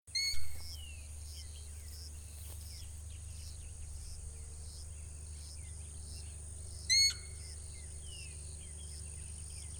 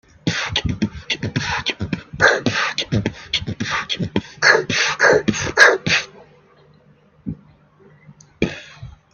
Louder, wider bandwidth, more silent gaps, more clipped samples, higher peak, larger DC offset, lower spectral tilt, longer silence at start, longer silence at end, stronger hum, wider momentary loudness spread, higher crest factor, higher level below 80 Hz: second, -40 LUFS vs -18 LUFS; first, 18 kHz vs 13 kHz; neither; neither; second, -18 dBFS vs 0 dBFS; neither; second, -0.5 dB/octave vs -3.5 dB/octave; second, 0.05 s vs 0.25 s; second, 0 s vs 0.25 s; neither; second, 15 LU vs 20 LU; about the same, 20 dB vs 20 dB; second, -50 dBFS vs -44 dBFS